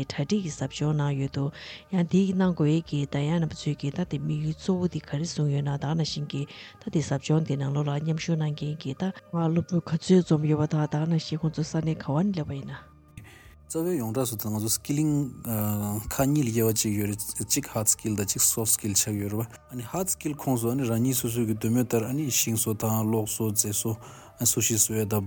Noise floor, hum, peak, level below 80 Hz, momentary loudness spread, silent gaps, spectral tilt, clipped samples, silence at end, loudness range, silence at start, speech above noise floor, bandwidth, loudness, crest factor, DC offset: -49 dBFS; none; -8 dBFS; -56 dBFS; 9 LU; none; -5 dB/octave; under 0.1%; 0 s; 4 LU; 0 s; 23 dB; 19 kHz; -26 LUFS; 18 dB; under 0.1%